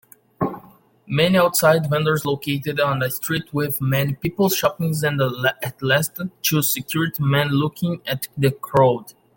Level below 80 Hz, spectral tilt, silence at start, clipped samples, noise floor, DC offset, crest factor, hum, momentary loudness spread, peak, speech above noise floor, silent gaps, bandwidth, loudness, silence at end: -54 dBFS; -5 dB/octave; 0.4 s; under 0.1%; -49 dBFS; under 0.1%; 18 dB; none; 9 LU; -2 dBFS; 29 dB; none; 17 kHz; -20 LUFS; 0.25 s